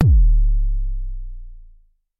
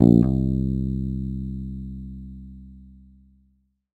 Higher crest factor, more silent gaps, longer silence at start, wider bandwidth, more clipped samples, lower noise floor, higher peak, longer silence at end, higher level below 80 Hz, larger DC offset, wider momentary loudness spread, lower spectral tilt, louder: second, 14 dB vs 24 dB; neither; about the same, 0 s vs 0 s; second, 0.9 kHz vs 7.8 kHz; neither; second, -51 dBFS vs -65 dBFS; about the same, -2 dBFS vs 0 dBFS; second, 0.6 s vs 1.15 s; first, -18 dBFS vs -34 dBFS; neither; about the same, 22 LU vs 23 LU; about the same, -12 dB/octave vs -12 dB/octave; first, -21 LUFS vs -24 LUFS